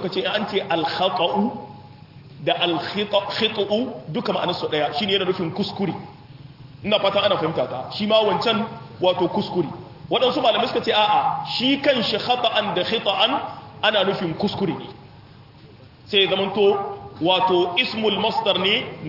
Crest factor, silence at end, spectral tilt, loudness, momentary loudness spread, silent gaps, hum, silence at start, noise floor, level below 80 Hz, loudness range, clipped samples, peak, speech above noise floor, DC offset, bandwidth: 18 dB; 0 s; -6 dB/octave; -21 LUFS; 9 LU; none; none; 0 s; -46 dBFS; -60 dBFS; 4 LU; under 0.1%; -4 dBFS; 25 dB; under 0.1%; 5.8 kHz